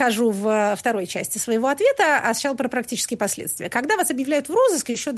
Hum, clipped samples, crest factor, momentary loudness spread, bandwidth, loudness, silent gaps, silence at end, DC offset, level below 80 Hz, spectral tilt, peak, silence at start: none; under 0.1%; 14 dB; 7 LU; 12.5 kHz; -21 LUFS; none; 0 s; under 0.1%; -64 dBFS; -3 dB/octave; -6 dBFS; 0 s